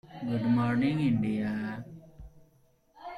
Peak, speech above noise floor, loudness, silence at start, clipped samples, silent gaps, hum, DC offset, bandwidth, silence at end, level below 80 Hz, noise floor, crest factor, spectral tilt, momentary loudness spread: -16 dBFS; 37 dB; -29 LUFS; 0.05 s; under 0.1%; none; none; under 0.1%; 11 kHz; 0 s; -58 dBFS; -65 dBFS; 14 dB; -8.5 dB/octave; 21 LU